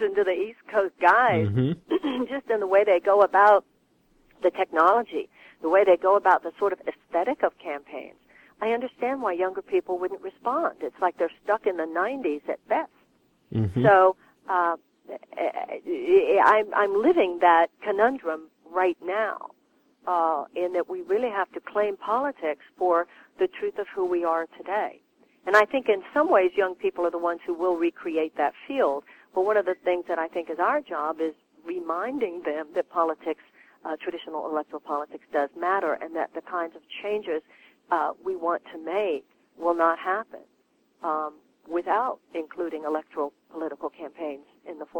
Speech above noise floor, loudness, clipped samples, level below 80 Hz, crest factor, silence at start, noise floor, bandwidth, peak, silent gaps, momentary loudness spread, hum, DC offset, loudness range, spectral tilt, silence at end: 41 dB; -25 LUFS; under 0.1%; -66 dBFS; 20 dB; 0 s; -66 dBFS; 17 kHz; -6 dBFS; none; 15 LU; none; under 0.1%; 8 LU; -7.5 dB/octave; 0 s